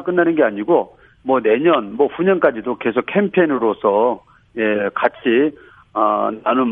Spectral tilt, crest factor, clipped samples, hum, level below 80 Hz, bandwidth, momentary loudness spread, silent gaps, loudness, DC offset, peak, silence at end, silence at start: -10 dB/octave; 16 dB; under 0.1%; none; -60 dBFS; 3.8 kHz; 7 LU; none; -17 LUFS; under 0.1%; 0 dBFS; 0 s; 0 s